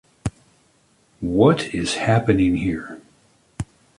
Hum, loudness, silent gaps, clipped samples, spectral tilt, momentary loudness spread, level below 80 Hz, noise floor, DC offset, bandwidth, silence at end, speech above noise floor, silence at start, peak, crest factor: none; -20 LUFS; none; under 0.1%; -6 dB/octave; 18 LU; -42 dBFS; -60 dBFS; under 0.1%; 11.5 kHz; 0.35 s; 41 dB; 0.25 s; -4 dBFS; 20 dB